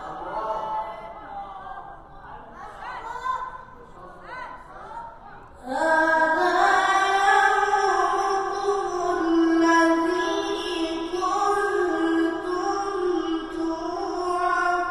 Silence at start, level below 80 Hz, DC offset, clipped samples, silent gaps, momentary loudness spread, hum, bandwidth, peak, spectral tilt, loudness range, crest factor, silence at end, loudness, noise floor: 0 s; -52 dBFS; under 0.1%; under 0.1%; none; 20 LU; none; 12 kHz; -6 dBFS; -3 dB/octave; 15 LU; 18 dB; 0 s; -23 LUFS; -44 dBFS